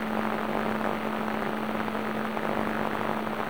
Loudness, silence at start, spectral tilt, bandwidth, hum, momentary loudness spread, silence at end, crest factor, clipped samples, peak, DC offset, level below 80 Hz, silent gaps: -30 LUFS; 0 s; -6 dB/octave; over 20 kHz; none; 1 LU; 0 s; 16 dB; under 0.1%; -14 dBFS; 0.6%; -56 dBFS; none